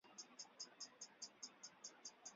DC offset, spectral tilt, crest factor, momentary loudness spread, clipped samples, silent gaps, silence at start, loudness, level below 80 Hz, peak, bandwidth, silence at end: under 0.1%; 0.5 dB/octave; 20 dB; 3 LU; under 0.1%; none; 0.05 s; -56 LUFS; under -90 dBFS; -40 dBFS; 7.6 kHz; 0 s